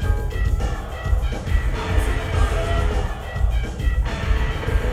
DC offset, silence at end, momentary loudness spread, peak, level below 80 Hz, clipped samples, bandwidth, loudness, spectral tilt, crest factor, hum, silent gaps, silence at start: under 0.1%; 0 s; 3 LU; -6 dBFS; -22 dBFS; under 0.1%; 14 kHz; -24 LUFS; -6 dB/octave; 14 dB; none; none; 0 s